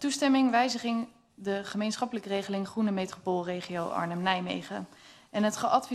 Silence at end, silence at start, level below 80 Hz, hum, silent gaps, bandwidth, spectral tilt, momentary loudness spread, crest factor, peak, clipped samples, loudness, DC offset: 0 s; 0 s; -72 dBFS; none; none; 13 kHz; -4.5 dB/octave; 12 LU; 20 dB; -10 dBFS; under 0.1%; -30 LUFS; under 0.1%